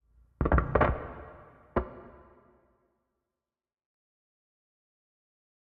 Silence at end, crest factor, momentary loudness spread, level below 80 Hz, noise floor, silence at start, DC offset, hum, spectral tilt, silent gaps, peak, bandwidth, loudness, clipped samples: 3.6 s; 26 dB; 22 LU; -40 dBFS; -90 dBFS; 0.4 s; under 0.1%; none; -7.5 dB/octave; none; -10 dBFS; 4.4 kHz; -30 LUFS; under 0.1%